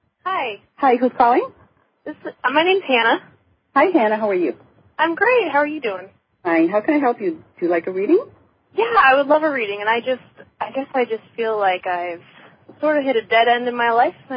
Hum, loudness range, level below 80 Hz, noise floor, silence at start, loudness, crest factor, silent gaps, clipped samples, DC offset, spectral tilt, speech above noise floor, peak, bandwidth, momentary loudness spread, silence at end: none; 3 LU; -64 dBFS; -47 dBFS; 0.25 s; -18 LUFS; 16 dB; none; under 0.1%; under 0.1%; -9 dB/octave; 28 dB; -2 dBFS; 5.2 kHz; 13 LU; 0 s